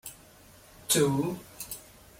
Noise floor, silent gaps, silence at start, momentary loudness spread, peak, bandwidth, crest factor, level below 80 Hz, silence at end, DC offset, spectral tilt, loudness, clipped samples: -54 dBFS; none; 0.05 s; 20 LU; -12 dBFS; 16.5 kHz; 20 dB; -62 dBFS; 0.35 s; under 0.1%; -4 dB/octave; -29 LUFS; under 0.1%